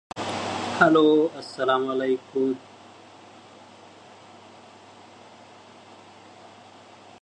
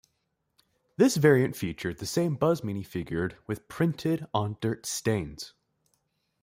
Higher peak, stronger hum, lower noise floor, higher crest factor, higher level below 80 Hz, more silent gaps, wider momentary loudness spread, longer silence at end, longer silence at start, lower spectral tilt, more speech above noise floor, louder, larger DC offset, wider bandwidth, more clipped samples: first, -4 dBFS vs -8 dBFS; neither; second, -49 dBFS vs -78 dBFS; about the same, 24 dB vs 20 dB; second, -68 dBFS vs -60 dBFS; neither; second, 12 LU vs 15 LU; first, 4.65 s vs 0.95 s; second, 0.15 s vs 1 s; about the same, -5 dB/octave vs -5.5 dB/octave; second, 27 dB vs 50 dB; first, -23 LUFS vs -28 LUFS; neither; second, 10.5 kHz vs 16.5 kHz; neither